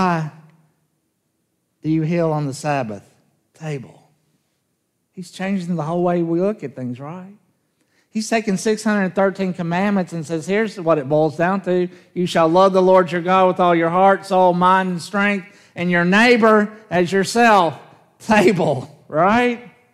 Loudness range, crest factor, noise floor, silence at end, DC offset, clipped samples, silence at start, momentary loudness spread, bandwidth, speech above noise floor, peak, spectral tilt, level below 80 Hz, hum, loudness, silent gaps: 9 LU; 18 dB; -70 dBFS; 0.3 s; under 0.1%; under 0.1%; 0 s; 16 LU; 14 kHz; 53 dB; 0 dBFS; -6 dB/octave; -64 dBFS; none; -17 LUFS; none